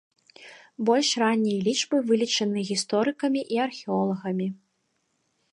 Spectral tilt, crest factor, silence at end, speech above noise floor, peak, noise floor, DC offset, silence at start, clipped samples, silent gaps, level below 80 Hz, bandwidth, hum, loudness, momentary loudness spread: -4 dB/octave; 18 dB; 0.95 s; 49 dB; -8 dBFS; -74 dBFS; under 0.1%; 0.4 s; under 0.1%; none; -76 dBFS; 11.5 kHz; none; -25 LUFS; 7 LU